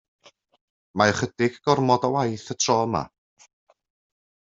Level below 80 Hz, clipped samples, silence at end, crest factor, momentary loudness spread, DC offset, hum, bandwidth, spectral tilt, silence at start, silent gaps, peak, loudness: -60 dBFS; under 0.1%; 1.5 s; 22 dB; 9 LU; under 0.1%; none; 8 kHz; -4.5 dB/octave; 0.95 s; none; -4 dBFS; -23 LUFS